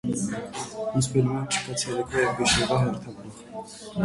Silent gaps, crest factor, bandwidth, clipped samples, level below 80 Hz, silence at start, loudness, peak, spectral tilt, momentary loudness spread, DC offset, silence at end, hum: none; 18 dB; 11.5 kHz; under 0.1%; -48 dBFS; 0.05 s; -26 LUFS; -10 dBFS; -4 dB/octave; 18 LU; under 0.1%; 0 s; none